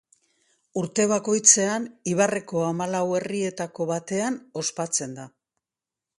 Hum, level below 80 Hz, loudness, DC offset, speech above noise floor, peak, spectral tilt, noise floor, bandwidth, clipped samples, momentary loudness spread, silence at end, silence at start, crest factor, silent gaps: none; -70 dBFS; -23 LUFS; under 0.1%; 65 dB; -2 dBFS; -3.5 dB/octave; -89 dBFS; 11.5 kHz; under 0.1%; 13 LU; 0.9 s; 0.75 s; 24 dB; none